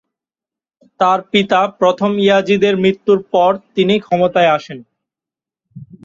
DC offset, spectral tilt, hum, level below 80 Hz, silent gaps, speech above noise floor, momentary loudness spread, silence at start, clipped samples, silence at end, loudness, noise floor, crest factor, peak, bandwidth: under 0.1%; -6 dB/octave; none; -58 dBFS; none; 75 dB; 4 LU; 1 s; under 0.1%; 0.2 s; -14 LUFS; -89 dBFS; 14 dB; 0 dBFS; 7.6 kHz